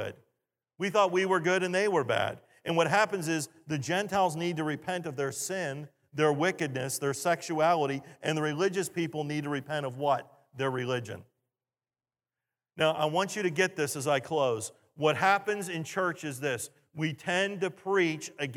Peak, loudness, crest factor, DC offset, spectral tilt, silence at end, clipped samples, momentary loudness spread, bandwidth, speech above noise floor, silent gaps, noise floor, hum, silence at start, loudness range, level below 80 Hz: -10 dBFS; -30 LUFS; 20 dB; under 0.1%; -4.5 dB/octave; 0 s; under 0.1%; 9 LU; 16.5 kHz; over 60 dB; none; under -90 dBFS; none; 0 s; 5 LU; -78 dBFS